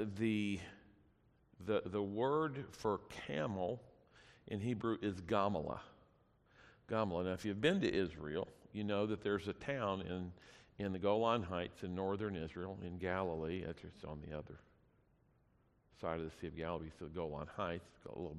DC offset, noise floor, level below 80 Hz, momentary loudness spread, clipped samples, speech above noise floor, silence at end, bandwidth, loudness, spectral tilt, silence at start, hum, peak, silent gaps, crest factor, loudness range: under 0.1%; -74 dBFS; -66 dBFS; 13 LU; under 0.1%; 34 dB; 0 s; 12.5 kHz; -41 LUFS; -7 dB/octave; 0 s; none; -20 dBFS; none; 22 dB; 7 LU